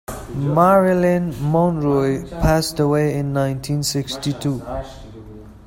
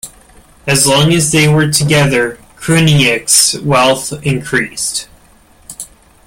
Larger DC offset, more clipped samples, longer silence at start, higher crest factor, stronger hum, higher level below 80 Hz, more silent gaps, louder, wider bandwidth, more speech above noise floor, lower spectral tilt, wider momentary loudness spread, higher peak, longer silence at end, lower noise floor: neither; neither; about the same, 0.1 s vs 0.05 s; about the same, 16 dB vs 12 dB; neither; first, -36 dBFS vs -42 dBFS; neither; second, -19 LUFS vs -11 LUFS; about the same, 16.5 kHz vs 17 kHz; second, 20 dB vs 34 dB; first, -6 dB/octave vs -3.5 dB/octave; second, 16 LU vs 19 LU; about the same, -2 dBFS vs 0 dBFS; second, 0.1 s vs 0.4 s; second, -38 dBFS vs -45 dBFS